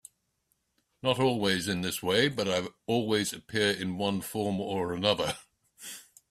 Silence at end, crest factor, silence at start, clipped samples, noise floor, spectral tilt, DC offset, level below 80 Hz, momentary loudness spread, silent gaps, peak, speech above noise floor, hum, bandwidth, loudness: 0.3 s; 22 dB; 1.05 s; under 0.1%; -76 dBFS; -4 dB/octave; under 0.1%; -64 dBFS; 14 LU; none; -8 dBFS; 47 dB; none; 15.5 kHz; -29 LUFS